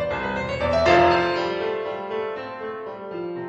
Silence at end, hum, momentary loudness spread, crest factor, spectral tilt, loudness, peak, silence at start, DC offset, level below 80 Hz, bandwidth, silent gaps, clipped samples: 0 s; none; 16 LU; 18 dB; -6 dB/octave; -23 LUFS; -4 dBFS; 0 s; under 0.1%; -46 dBFS; 8.2 kHz; none; under 0.1%